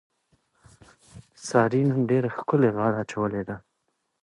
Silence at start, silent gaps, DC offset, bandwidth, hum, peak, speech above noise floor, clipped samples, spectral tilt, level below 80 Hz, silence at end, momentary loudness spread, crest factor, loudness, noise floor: 1.15 s; none; under 0.1%; 11.5 kHz; none; -6 dBFS; 52 dB; under 0.1%; -7.5 dB/octave; -62 dBFS; 0.65 s; 13 LU; 20 dB; -24 LUFS; -76 dBFS